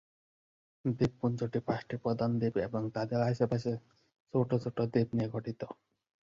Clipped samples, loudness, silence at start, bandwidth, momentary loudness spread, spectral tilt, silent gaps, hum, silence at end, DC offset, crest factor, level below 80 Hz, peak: under 0.1%; -33 LUFS; 0.85 s; 7.4 kHz; 8 LU; -8.5 dB/octave; 4.20-4.26 s; none; 0.65 s; under 0.1%; 18 dB; -62 dBFS; -16 dBFS